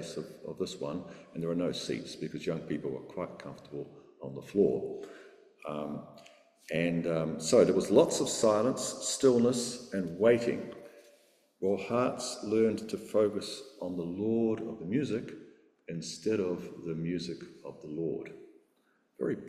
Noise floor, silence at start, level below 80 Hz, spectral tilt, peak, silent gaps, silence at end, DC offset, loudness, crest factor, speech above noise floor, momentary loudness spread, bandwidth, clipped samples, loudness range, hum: -72 dBFS; 0 s; -68 dBFS; -5 dB/octave; -10 dBFS; none; 0 s; under 0.1%; -32 LUFS; 22 dB; 41 dB; 18 LU; 14.5 kHz; under 0.1%; 9 LU; none